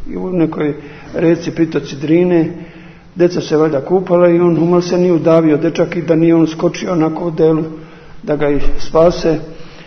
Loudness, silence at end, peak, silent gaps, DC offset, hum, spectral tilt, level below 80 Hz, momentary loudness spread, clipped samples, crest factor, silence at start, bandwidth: -14 LUFS; 0.05 s; 0 dBFS; none; under 0.1%; none; -7.5 dB/octave; -30 dBFS; 10 LU; under 0.1%; 14 dB; 0 s; 6.6 kHz